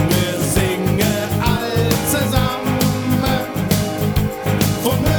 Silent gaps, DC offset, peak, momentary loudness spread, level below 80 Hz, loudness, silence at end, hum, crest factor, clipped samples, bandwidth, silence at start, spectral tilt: none; under 0.1%; -2 dBFS; 2 LU; -32 dBFS; -18 LUFS; 0 s; none; 14 dB; under 0.1%; over 20 kHz; 0 s; -5 dB/octave